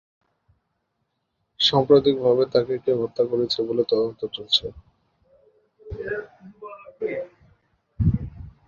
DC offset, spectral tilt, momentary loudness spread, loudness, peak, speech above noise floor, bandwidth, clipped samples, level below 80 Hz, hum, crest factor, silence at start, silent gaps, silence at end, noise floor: under 0.1%; -6.5 dB/octave; 22 LU; -22 LUFS; -4 dBFS; 54 dB; 7.4 kHz; under 0.1%; -44 dBFS; none; 22 dB; 1.6 s; none; 0.2 s; -75 dBFS